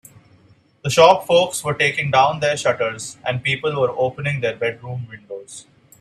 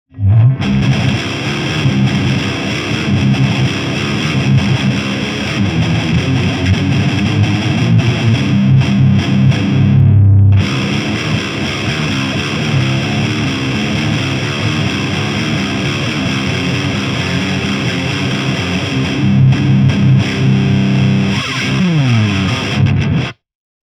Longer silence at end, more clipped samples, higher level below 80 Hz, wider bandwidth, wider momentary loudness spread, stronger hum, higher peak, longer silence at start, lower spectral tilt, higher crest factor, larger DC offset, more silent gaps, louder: second, 0.4 s vs 0.55 s; neither; second, -58 dBFS vs -36 dBFS; first, 14 kHz vs 10 kHz; first, 20 LU vs 6 LU; neither; about the same, 0 dBFS vs 0 dBFS; first, 0.85 s vs 0.15 s; second, -4 dB/octave vs -6 dB/octave; first, 20 dB vs 12 dB; neither; neither; second, -18 LUFS vs -13 LUFS